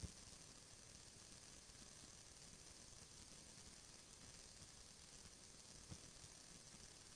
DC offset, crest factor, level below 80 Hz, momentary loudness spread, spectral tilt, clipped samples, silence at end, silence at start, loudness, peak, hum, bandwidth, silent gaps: under 0.1%; 22 dB; -70 dBFS; 2 LU; -2 dB/octave; under 0.1%; 0 s; 0 s; -60 LUFS; -40 dBFS; none; 11 kHz; none